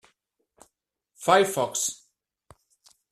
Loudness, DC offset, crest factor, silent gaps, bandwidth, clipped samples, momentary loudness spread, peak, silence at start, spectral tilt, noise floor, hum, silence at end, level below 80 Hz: -24 LUFS; under 0.1%; 24 dB; none; 15 kHz; under 0.1%; 10 LU; -4 dBFS; 1.2 s; -2.5 dB/octave; -76 dBFS; none; 1.15 s; -70 dBFS